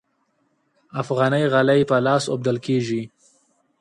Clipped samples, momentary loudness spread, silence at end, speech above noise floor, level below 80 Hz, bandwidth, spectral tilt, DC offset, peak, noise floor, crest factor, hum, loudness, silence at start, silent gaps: under 0.1%; 12 LU; 0.75 s; 48 dB; -62 dBFS; 11.5 kHz; -6 dB/octave; under 0.1%; -6 dBFS; -68 dBFS; 16 dB; none; -20 LUFS; 0.95 s; none